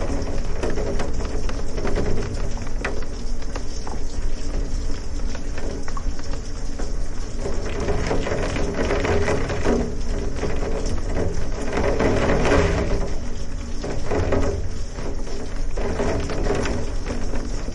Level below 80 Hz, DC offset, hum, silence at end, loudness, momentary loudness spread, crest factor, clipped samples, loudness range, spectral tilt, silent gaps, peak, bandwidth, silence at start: -26 dBFS; under 0.1%; none; 0 s; -26 LUFS; 10 LU; 16 dB; under 0.1%; 8 LU; -5.5 dB/octave; none; -4 dBFS; 10 kHz; 0 s